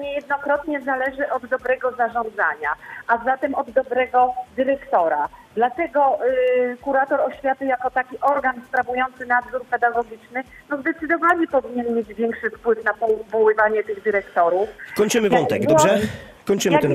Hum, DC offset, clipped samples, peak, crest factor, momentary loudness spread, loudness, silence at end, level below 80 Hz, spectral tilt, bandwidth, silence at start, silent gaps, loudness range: none; under 0.1%; under 0.1%; -2 dBFS; 18 dB; 8 LU; -21 LUFS; 0 s; -56 dBFS; -4.5 dB/octave; 15.5 kHz; 0 s; none; 3 LU